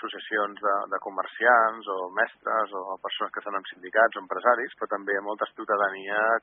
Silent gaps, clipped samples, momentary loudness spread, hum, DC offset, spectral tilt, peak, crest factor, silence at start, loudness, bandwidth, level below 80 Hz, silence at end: none; under 0.1%; 11 LU; none; under 0.1%; 0.5 dB/octave; -6 dBFS; 20 dB; 0 s; -26 LUFS; 3.9 kHz; -84 dBFS; 0.05 s